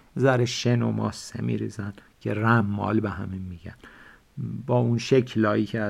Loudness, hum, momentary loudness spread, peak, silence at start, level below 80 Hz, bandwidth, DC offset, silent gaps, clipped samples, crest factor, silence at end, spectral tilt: -25 LUFS; none; 15 LU; -8 dBFS; 0.15 s; -56 dBFS; 11.5 kHz; under 0.1%; none; under 0.1%; 18 dB; 0 s; -6.5 dB/octave